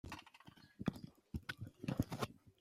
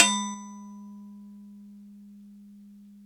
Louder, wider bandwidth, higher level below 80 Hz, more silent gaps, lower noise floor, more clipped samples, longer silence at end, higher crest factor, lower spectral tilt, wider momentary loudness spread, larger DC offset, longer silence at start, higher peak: second, -46 LUFS vs -28 LUFS; about the same, 16 kHz vs 17 kHz; first, -62 dBFS vs -86 dBFS; neither; first, -64 dBFS vs -50 dBFS; neither; second, 0.1 s vs 1.2 s; second, 24 dB vs 30 dB; first, -6 dB/octave vs -1 dB/octave; about the same, 18 LU vs 18 LU; neither; about the same, 0.05 s vs 0 s; second, -22 dBFS vs -2 dBFS